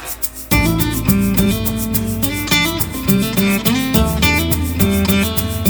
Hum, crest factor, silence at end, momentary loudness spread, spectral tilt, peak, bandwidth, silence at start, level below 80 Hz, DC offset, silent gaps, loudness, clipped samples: none; 16 dB; 0 s; 5 LU; -4.5 dB/octave; 0 dBFS; over 20 kHz; 0 s; -26 dBFS; under 0.1%; none; -15 LUFS; under 0.1%